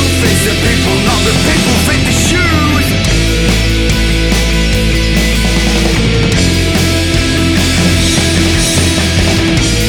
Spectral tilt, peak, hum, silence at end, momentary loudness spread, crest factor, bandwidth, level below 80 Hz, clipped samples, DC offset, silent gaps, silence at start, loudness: -4 dB/octave; 0 dBFS; none; 0 s; 2 LU; 10 dB; 19 kHz; -16 dBFS; under 0.1%; under 0.1%; none; 0 s; -10 LUFS